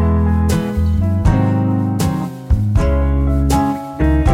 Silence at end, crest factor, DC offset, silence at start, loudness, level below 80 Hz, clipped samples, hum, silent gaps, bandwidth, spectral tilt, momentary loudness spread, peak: 0 s; 12 dB; under 0.1%; 0 s; -16 LUFS; -20 dBFS; under 0.1%; none; none; 15.5 kHz; -7.5 dB/octave; 4 LU; -2 dBFS